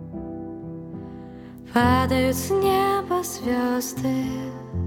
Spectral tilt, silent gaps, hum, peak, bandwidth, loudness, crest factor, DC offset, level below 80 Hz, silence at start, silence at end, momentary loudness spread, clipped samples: -5.5 dB/octave; none; none; -4 dBFS; 18.5 kHz; -23 LUFS; 20 dB; under 0.1%; -44 dBFS; 0 s; 0 s; 17 LU; under 0.1%